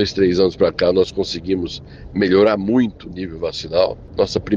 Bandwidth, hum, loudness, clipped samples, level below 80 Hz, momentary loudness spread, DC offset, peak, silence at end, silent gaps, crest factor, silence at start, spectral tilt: 7.6 kHz; none; -18 LUFS; under 0.1%; -42 dBFS; 13 LU; under 0.1%; -4 dBFS; 0 s; none; 14 dB; 0 s; -6 dB/octave